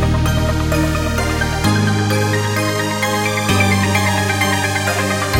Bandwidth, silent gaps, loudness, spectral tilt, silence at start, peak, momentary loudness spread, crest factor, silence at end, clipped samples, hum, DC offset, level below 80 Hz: 17 kHz; none; -16 LUFS; -4.5 dB/octave; 0 s; -2 dBFS; 3 LU; 14 dB; 0 s; under 0.1%; none; under 0.1%; -28 dBFS